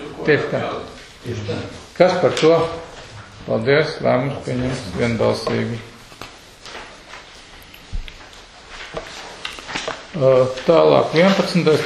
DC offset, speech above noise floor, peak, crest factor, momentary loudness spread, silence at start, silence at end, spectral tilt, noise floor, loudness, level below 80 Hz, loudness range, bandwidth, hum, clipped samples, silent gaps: under 0.1%; 24 dB; 0 dBFS; 20 dB; 23 LU; 0 s; 0 s; -6 dB/octave; -41 dBFS; -18 LUFS; -42 dBFS; 16 LU; 13 kHz; none; under 0.1%; none